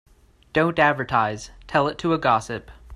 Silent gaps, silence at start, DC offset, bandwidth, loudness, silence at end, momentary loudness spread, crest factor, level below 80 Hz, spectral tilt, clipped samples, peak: none; 0.55 s; under 0.1%; 12 kHz; -22 LUFS; 0 s; 13 LU; 20 dB; -48 dBFS; -5.5 dB/octave; under 0.1%; -4 dBFS